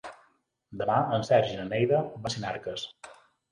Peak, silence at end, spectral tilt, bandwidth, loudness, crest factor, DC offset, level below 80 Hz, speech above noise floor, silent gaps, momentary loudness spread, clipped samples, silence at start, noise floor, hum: -10 dBFS; 0.4 s; -5.5 dB/octave; 11 kHz; -28 LUFS; 20 dB; under 0.1%; -62 dBFS; 41 dB; none; 15 LU; under 0.1%; 0.05 s; -68 dBFS; none